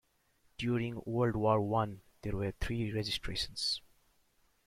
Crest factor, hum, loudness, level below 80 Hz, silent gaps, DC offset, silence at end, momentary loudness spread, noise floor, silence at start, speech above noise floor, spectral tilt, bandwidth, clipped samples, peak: 20 dB; none; -35 LUFS; -52 dBFS; none; under 0.1%; 0.9 s; 9 LU; -72 dBFS; 0.6 s; 38 dB; -5.5 dB/octave; 15 kHz; under 0.1%; -16 dBFS